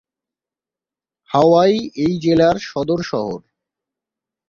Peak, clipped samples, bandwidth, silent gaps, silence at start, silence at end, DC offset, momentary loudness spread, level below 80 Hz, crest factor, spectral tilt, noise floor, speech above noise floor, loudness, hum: -2 dBFS; under 0.1%; 7.2 kHz; none; 1.3 s; 1.1 s; under 0.1%; 11 LU; -52 dBFS; 18 dB; -6.5 dB/octave; -89 dBFS; 74 dB; -17 LUFS; none